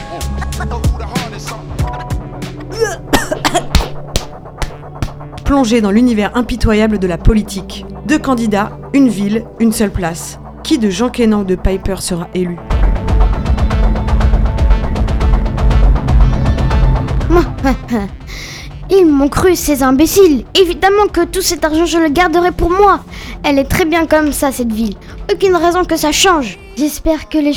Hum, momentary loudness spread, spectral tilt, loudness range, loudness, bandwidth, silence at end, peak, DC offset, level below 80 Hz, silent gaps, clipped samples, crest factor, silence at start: none; 14 LU; -5.5 dB/octave; 7 LU; -13 LUFS; 17.5 kHz; 0 s; 0 dBFS; under 0.1%; -18 dBFS; none; under 0.1%; 12 dB; 0 s